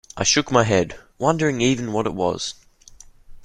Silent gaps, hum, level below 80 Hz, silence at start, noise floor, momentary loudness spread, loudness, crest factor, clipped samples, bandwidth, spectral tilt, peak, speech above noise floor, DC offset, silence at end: none; none; -48 dBFS; 0.15 s; -47 dBFS; 9 LU; -21 LUFS; 20 dB; under 0.1%; 12 kHz; -4 dB/octave; -2 dBFS; 26 dB; under 0.1%; 0 s